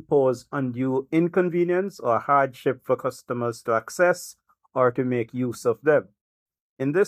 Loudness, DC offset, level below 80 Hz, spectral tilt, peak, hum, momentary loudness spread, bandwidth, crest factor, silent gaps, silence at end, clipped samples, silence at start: -24 LUFS; under 0.1%; -70 dBFS; -6.5 dB/octave; -6 dBFS; none; 8 LU; 15.5 kHz; 18 dB; 6.21-6.46 s, 6.60-6.77 s; 0 s; under 0.1%; 0.1 s